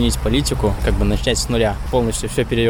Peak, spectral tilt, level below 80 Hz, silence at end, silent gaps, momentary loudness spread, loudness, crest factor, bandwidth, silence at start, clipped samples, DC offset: -4 dBFS; -5 dB/octave; -24 dBFS; 0 s; none; 2 LU; -19 LUFS; 12 dB; 19.5 kHz; 0 s; under 0.1%; under 0.1%